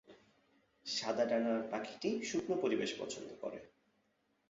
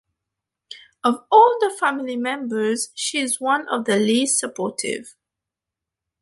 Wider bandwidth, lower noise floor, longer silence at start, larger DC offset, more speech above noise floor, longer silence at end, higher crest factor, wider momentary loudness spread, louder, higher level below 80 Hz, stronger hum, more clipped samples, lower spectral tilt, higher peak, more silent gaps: second, 7.6 kHz vs 12 kHz; second, -78 dBFS vs -86 dBFS; second, 0.1 s vs 0.7 s; neither; second, 41 dB vs 66 dB; second, 0.8 s vs 1.1 s; about the same, 18 dB vs 20 dB; about the same, 12 LU vs 12 LU; second, -38 LUFS vs -20 LUFS; second, -78 dBFS vs -72 dBFS; neither; neither; about the same, -3 dB/octave vs -2.5 dB/octave; second, -20 dBFS vs -2 dBFS; neither